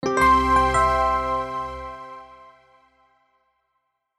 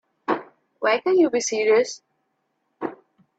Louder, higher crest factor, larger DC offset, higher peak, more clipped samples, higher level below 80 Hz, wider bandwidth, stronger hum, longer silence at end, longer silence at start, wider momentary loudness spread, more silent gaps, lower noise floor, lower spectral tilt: about the same, -20 LUFS vs -22 LUFS; about the same, 16 dB vs 16 dB; neither; about the same, -6 dBFS vs -8 dBFS; neither; first, -38 dBFS vs -74 dBFS; first, 12.5 kHz vs 8.4 kHz; neither; first, 1.85 s vs 0.45 s; second, 0.05 s vs 0.3 s; first, 21 LU vs 15 LU; neither; about the same, -75 dBFS vs -73 dBFS; first, -5 dB/octave vs -3 dB/octave